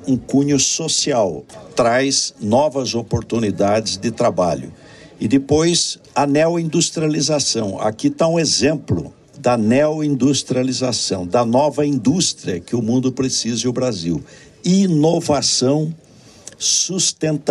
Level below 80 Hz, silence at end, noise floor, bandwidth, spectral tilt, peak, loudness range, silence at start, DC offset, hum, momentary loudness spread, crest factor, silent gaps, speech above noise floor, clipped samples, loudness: -50 dBFS; 0 s; -41 dBFS; 12.5 kHz; -4 dB/octave; -2 dBFS; 2 LU; 0 s; under 0.1%; none; 7 LU; 16 dB; none; 24 dB; under 0.1%; -17 LUFS